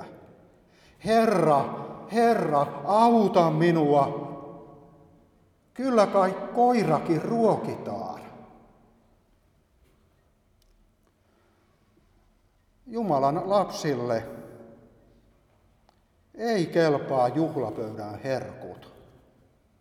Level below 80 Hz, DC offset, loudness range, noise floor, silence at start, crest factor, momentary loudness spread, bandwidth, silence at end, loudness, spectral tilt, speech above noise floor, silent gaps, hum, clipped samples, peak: -64 dBFS; under 0.1%; 9 LU; -65 dBFS; 0 s; 20 dB; 20 LU; 14.5 kHz; 1 s; -25 LUFS; -7 dB/octave; 41 dB; none; none; under 0.1%; -6 dBFS